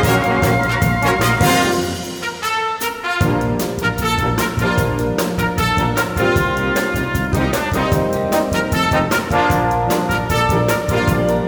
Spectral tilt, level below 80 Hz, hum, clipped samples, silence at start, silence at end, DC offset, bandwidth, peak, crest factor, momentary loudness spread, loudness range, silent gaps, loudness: -5 dB/octave; -30 dBFS; none; under 0.1%; 0 s; 0 s; under 0.1%; over 20 kHz; -2 dBFS; 14 dB; 5 LU; 2 LU; none; -17 LUFS